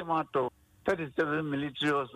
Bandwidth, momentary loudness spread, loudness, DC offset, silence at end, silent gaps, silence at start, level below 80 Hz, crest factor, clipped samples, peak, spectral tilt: 13.5 kHz; 5 LU; -32 LUFS; under 0.1%; 0 s; none; 0 s; -64 dBFS; 14 dB; under 0.1%; -16 dBFS; -6 dB/octave